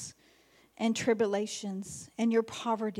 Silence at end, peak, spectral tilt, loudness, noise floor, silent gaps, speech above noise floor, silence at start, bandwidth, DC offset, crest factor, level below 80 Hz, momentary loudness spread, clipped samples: 0 s; -16 dBFS; -4.5 dB/octave; -32 LUFS; -64 dBFS; none; 33 dB; 0 s; 13.5 kHz; under 0.1%; 16 dB; -74 dBFS; 11 LU; under 0.1%